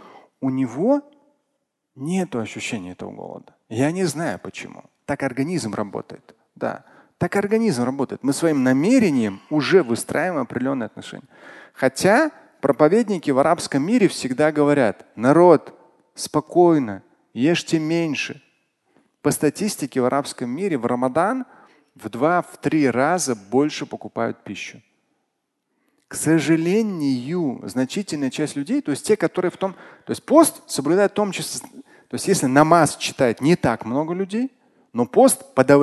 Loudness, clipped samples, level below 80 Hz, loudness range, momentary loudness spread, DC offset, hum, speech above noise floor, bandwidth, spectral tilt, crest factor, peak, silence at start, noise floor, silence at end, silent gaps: -20 LUFS; under 0.1%; -60 dBFS; 8 LU; 15 LU; under 0.1%; none; 55 dB; 12.5 kHz; -5.5 dB/octave; 20 dB; 0 dBFS; 0.4 s; -75 dBFS; 0 s; none